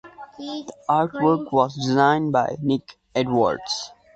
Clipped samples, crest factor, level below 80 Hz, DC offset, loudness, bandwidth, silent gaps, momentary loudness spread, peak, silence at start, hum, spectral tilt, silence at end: under 0.1%; 18 dB; -58 dBFS; under 0.1%; -22 LUFS; 8.6 kHz; none; 14 LU; -4 dBFS; 0.05 s; none; -5.5 dB/octave; 0.3 s